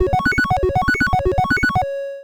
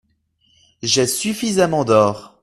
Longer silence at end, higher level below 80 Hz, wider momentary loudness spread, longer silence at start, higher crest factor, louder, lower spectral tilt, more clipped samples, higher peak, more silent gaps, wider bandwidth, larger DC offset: second, 0 s vs 0.15 s; first, -30 dBFS vs -54 dBFS; second, 2 LU vs 5 LU; second, 0 s vs 0.85 s; about the same, 14 dB vs 18 dB; about the same, -18 LUFS vs -17 LUFS; first, -6 dB/octave vs -4 dB/octave; neither; second, -4 dBFS vs 0 dBFS; neither; first, over 20 kHz vs 14.5 kHz; neither